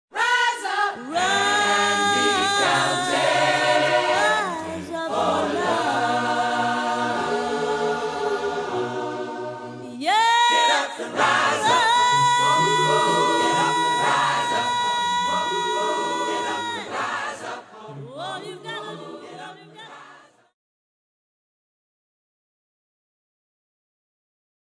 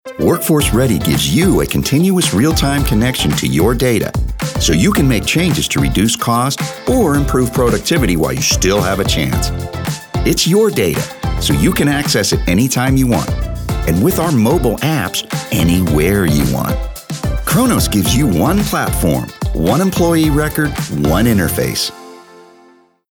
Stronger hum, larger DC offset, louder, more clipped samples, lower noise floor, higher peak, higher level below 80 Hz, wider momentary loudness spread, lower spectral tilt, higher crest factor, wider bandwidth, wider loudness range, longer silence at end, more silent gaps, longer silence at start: neither; neither; second, -21 LUFS vs -14 LUFS; neither; about the same, -50 dBFS vs -48 dBFS; second, -6 dBFS vs -2 dBFS; second, -68 dBFS vs -24 dBFS; first, 16 LU vs 7 LU; second, -2.5 dB/octave vs -5 dB/octave; first, 18 dB vs 12 dB; second, 11 kHz vs over 20 kHz; first, 14 LU vs 2 LU; first, 4.5 s vs 0.7 s; neither; about the same, 0.15 s vs 0.05 s